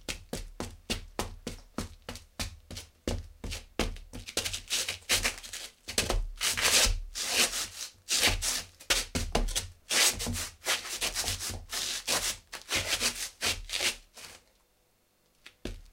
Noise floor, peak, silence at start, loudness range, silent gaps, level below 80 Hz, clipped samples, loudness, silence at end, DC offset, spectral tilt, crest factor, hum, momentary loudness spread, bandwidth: -70 dBFS; -8 dBFS; 0 s; 11 LU; none; -42 dBFS; under 0.1%; -30 LUFS; 0 s; under 0.1%; -1 dB/octave; 26 dB; none; 17 LU; 17 kHz